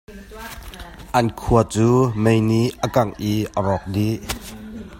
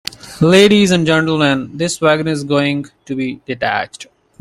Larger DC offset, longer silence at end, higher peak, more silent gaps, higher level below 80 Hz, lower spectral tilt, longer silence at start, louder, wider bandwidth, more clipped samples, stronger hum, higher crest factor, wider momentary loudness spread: neither; second, 0 s vs 0.35 s; about the same, 0 dBFS vs 0 dBFS; neither; first, -38 dBFS vs -50 dBFS; first, -6.5 dB/octave vs -5 dB/octave; second, 0.1 s vs 0.25 s; second, -20 LUFS vs -14 LUFS; about the same, 16.5 kHz vs 15.5 kHz; neither; neither; first, 20 dB vs 14 dB; first, 19 LU vs 14 LU